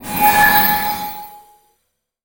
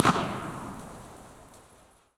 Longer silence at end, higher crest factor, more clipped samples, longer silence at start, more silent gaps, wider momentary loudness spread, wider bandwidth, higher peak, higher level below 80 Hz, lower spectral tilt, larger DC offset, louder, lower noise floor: first, 0.85 s vs 0.55 s; second, 16 dB vs 30 dB; neither; about the same, 0 s vs 0 s; neither; second, 17 LU vs 23 LU; first, over 20 kHz vs 16.5 kHz; about the same, -2 dBFS vs -2 dBFS; first, -42 dBFS vs -56 dBFS; second, -2 dB/octave vs -5 dB/octave; neither; first, -13 LUFS vs -33 LUFS; first, -70 dBFS vs -59 dBFS